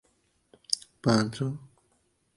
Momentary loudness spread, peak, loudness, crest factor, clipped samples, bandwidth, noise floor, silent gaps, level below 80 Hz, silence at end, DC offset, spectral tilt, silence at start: 9 LU; -6 dBFS; -29 LUFS; 26 dB; under 0.1%; 11.5 kHz; -71 dBFS; none; -64 dBFS; 0.7 s; under 0.1%; -5 dB/octave; 0.7 s